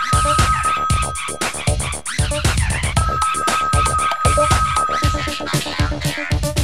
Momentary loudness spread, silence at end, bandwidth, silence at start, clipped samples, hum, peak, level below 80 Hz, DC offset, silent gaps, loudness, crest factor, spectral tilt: 6 LU; 0 s; 16 kHz; 0 s; under 0.1%; none; -2 dBFS; -26 dBFS; 1%; none; -18 LUFS; 16 dB; -3.5 dB/octave